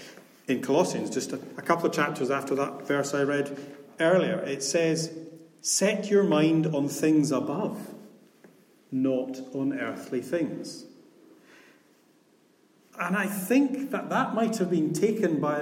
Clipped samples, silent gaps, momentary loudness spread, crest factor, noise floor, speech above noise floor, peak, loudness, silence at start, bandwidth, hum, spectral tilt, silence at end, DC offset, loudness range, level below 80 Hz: under 0.1%; none; 12 LU; 18 dB; -62 dBFS; 36 dB; -10 dBFS; -27 LUFS; 0 s; 16.5 kHz; none; -5 dB/octave; 0 s; under 0.1%; 9 LU; -78 dBFS